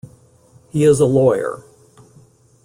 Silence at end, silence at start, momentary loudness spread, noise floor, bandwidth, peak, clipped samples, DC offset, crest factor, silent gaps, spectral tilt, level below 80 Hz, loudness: 1.05 s; 0.05 s; 14 LU; -50 dBFS; 14.5 kHz; -2 dBFS; under 0.1%; under 0.1%; 16 dB; none; -7 dB/octave; -52 dBFS; -16 LUFS